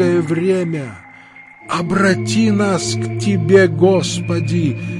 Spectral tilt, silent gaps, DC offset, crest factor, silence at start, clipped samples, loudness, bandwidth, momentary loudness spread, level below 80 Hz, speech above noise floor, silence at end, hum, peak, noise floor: -6 dB/octave; none; under 0.1%; 14 dB; 0 s; under 0.1%; -16 LUFS; 11.5 kHz; 10 LU; -52 dBFS; 25 dB; 0 s; none; 0 dBFS; -41 dBFS